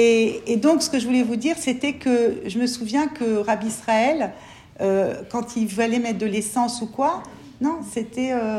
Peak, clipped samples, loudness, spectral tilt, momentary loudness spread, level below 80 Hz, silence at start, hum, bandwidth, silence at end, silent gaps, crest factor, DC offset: -6 dBFS; under 0.1%; -22 LUFS; -4.5 dB/octave; 7 LU; -58 dBFS; 0 s; none; 14 kHz; 0 s; none; 16 dB; under 0.1%